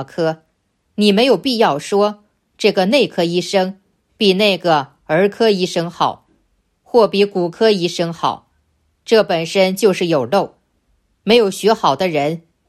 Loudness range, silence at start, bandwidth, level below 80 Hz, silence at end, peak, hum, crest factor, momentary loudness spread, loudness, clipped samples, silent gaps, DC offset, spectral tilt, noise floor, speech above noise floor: 2 LU; 0 s; 13.5 kHz; -62 dBFS; 0.3 s; 0 dBFS; none; 16 dB; 8 LU; -16 LUFS; under 0.1%; none; under 0.1%; -5 dB/octave; -65 dBFS; 50 dB